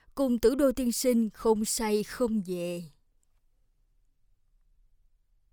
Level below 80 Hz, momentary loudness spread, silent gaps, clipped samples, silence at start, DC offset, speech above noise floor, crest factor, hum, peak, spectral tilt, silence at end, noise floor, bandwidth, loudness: -54 dBFS; 9 LU; none; under 0.1%; 0.15 s; under 0.1%; 40 dB; 18 dB; none; -12 dBFS; -4.5 dB/octave; 2.65 s; -68 dBFS; over 20 kHz; -28 LUFS